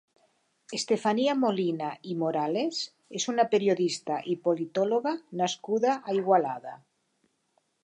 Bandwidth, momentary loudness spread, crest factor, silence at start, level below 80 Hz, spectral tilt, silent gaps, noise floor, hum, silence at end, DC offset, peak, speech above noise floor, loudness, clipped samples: 10.5 kHz; 10 LU; 18 dB; 0.7 s; -82 dBFS; -4.5 dB/octave; none; -73 dBFS; none; 1.05 s; under 0.1%; -10 dBFS; 46 dB; -28 LUFS; under 0.1%